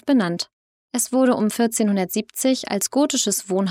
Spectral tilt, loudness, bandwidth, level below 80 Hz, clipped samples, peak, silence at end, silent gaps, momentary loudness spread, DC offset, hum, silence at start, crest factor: -4 dB/octave; -21 LUFS; 17 kHz; -70 dBFS; under 0.1%; -8 dBFS; 0 s; 0.53-0.89 s; 6 LU; under 0.1%; none; 0.05 s; 12 dB